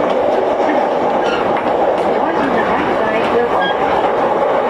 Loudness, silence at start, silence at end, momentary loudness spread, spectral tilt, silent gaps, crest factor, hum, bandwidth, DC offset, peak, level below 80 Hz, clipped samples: -15 LUFS; 0 s; 0 s; 1 LU; -6 dB/octave; none; 12 dB; none; 12.5 kHz; under 0.1%; -2 dBFS; -46 dBFS; under 0.1%